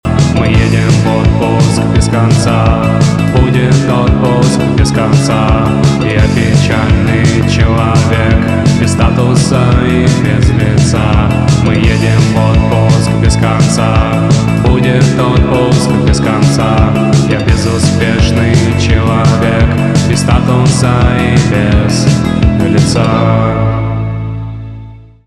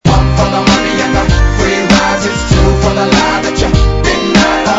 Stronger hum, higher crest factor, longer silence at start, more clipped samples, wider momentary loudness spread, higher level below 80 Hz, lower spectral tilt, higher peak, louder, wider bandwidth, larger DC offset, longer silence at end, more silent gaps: neither; about the same, 8 dB vs 10 dB; about the same, 0.05 s vs 0.05 s; second, under 0.1% vs 0.4%; about the same, 1 LU vs 3 LU; about the same, -18 dBFS vs -16 dBFS; first, -6.5 dB/octave vs -5 dB/octave; about the same, 0 dBFS vs 0 dBFS; about the same, -9 LUFS vs -10 LUFS; first, 12 kHz vs 8 kHz; neither; first, 0.25 s vs 0 s; neither